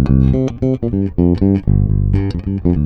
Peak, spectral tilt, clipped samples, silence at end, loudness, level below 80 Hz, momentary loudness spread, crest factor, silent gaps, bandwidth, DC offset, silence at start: 0 dBFS; -10.5 dB/octave; under 0.1%; 0 s; -16 LUFS; -22 dBFS; 5 LU; 14 dB; none; 6.2 kHz; under 0.1%; 0 s